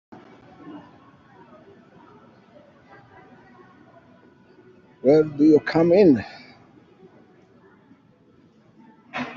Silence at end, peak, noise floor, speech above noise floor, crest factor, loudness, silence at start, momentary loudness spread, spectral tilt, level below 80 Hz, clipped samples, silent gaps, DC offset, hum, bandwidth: 0 s; -4 dBFS; -56 dBFS; 40 dB; 20 dB; -18 LUFS; 0.65 s; 27 LU; -6.5 dB/octave; -64 dBFS; under 0.1%; none; under 0.1%; none; 7 kHz